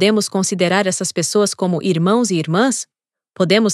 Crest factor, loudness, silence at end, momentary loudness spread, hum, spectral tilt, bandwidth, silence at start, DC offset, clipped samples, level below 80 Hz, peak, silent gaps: 16 dB; -17 LUFS; 0 s; 4 LU; none; -4.5 dB/octave; 13.5 kHz; 0 s; under 0.1%; under 0.1%; -76 dBFS; 0 dBFS; none